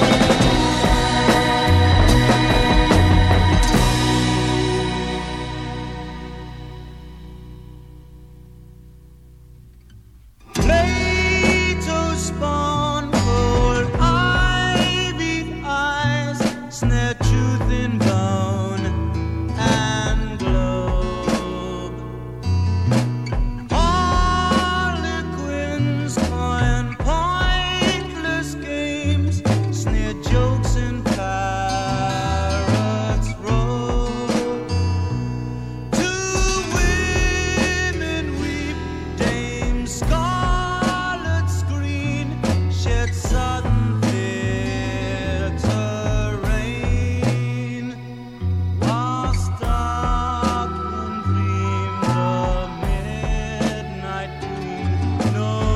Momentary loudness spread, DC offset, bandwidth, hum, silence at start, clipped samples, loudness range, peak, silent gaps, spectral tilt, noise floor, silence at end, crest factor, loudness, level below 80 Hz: 10 LU; 0.3%; 13.5 kHz; none; 0 s; under 0.1%; 5 LU; 0 dBFS; none; -5.5 dB/octave; -45 dBFS; 0 s; 20 dB; -20 LUFS; -26 dBFS